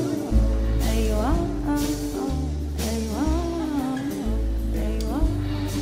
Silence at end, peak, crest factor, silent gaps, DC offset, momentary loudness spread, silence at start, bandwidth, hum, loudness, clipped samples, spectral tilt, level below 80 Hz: 0 s; -10 dBFS; 14 dB; none; under 0.1%; 4 LU; 0 s; 16 kHz; none; -25 LUFS; under 0.1%; -6.5 dB/octave; -26 dBFS